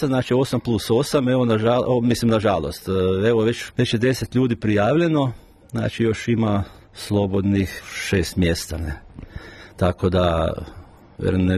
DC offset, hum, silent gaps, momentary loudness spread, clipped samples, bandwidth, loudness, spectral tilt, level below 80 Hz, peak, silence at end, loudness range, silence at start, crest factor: under 0.1%; none; none; 13 LU; under 0.1%; 13.5 kHz; -21 LUFS; -6.5 dB/octave; -40 dBFS; -6 dBFS; 0 s; 4 LU; 0 s; 14 dB